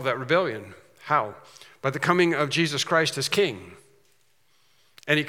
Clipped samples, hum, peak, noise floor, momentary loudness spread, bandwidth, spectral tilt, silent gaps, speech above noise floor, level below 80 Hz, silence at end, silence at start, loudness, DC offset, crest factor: under 0.1%; none; -4 dBFS; -67 dBFS; 18 LU; 17 kHz; -4 dB/octave; none; 42 dB; -76 dBFS; 0 s; 0 s; -24 LUFS; under 0.1%; 22 dB